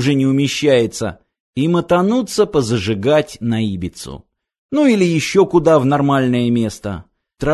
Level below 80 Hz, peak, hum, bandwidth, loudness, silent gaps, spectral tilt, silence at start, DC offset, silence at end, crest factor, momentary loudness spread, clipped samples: -42 dBFS; 0 dBFS; none; 12.5 kHz; -16 LUFS; 1.40-1.53 s, 4.58-4.69 s; -6 dB/octave; 0 s; under 0.1%; 0 s; 16 dB; 13 LU; under 0.1%